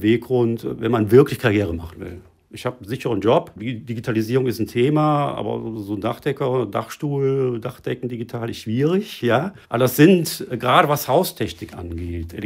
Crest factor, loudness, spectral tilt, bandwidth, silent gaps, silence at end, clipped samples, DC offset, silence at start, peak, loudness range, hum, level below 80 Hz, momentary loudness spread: 20 dB; -20 LUFS; -6.5 dB/octave; 16 kHz; none; 0 s; under 0.1%; under 0.1%; 0 s; 0 dBFS; 5 LU; none; -52 dBFS; 15 LU